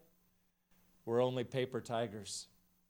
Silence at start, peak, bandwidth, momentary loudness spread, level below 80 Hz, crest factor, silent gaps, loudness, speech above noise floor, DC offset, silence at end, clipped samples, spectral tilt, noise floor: 1.05 s; -20 dBFS; over 20 kHz; 13 LU; -78 dBFS; 20 dB; none; -38 LUFS; 38 dB; under 0.1%; 0.45 s; under 0.1%; -5 dB/octave; -76 dBFS